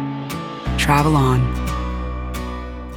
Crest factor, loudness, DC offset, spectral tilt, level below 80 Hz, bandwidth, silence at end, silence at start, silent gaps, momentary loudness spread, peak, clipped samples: 18 dB; -20 LUFS; under 0.1%; -6 dB/octave; -28 dBFS; 19 kHz; 0 s; 0 s; none; 13 LU; -2 dBFS; under 0.1%